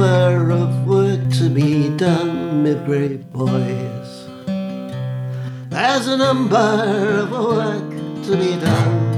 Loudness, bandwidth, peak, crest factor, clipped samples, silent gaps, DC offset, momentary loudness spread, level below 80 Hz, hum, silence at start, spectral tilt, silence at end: -18 LUFS; 12 kHz; -2 dBFS; 14 dB; under 0.1%; none; under 0.1%; 11 LU; -60 dBFS; none; 0 s; -7 dB/octave; 0 s